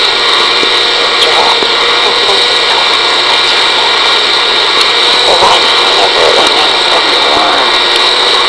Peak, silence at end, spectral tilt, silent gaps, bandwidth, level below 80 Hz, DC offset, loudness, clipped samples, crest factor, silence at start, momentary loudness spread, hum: 0 dBFS; 0 s; -0.5 dB/octave; none; 11 kHz; -42 dBFS; under 0.1%; -6 LUFS; under 0.1%; 8 dB; 0 s; 1 LU; none